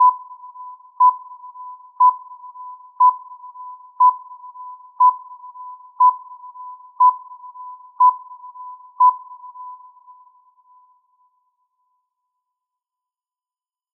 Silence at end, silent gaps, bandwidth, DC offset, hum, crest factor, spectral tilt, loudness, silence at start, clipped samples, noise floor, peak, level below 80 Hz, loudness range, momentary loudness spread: 4.25 s; none; 1.2 kHz; under 0.1%; none; 16 dB; 7.5 dB/octave; -16 LUFS; 0 s; under 0.1%; under -90 dBFS; -6 dBFS; under -90 dBFS; 5 LU; 22 LU